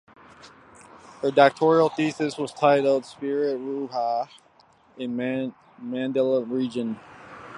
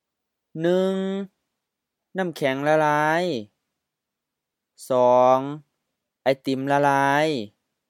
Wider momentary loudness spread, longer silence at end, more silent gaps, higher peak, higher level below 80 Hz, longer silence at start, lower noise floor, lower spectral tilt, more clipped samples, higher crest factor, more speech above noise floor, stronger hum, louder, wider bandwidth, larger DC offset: about the same, 16 LU vs 16 LU; second, 0 s vs 0.4 s; neither; first, -2 dBFS vs -6 dBFS; first, -70 dBFS vs -80 dBFS; about the same, 0.45 s vs 0.55 s; second, -58 dBFS vs -84 dBFS; about the same, -6 dB/octave vs -6 dB/octave; neither; first, 24 dB vs 18 dB; second, 34 dB vs 63 dB; neither; about the same, -24 LUFS vs -22 LUFS; second, 11 kHz vs 15.5 kHz; neither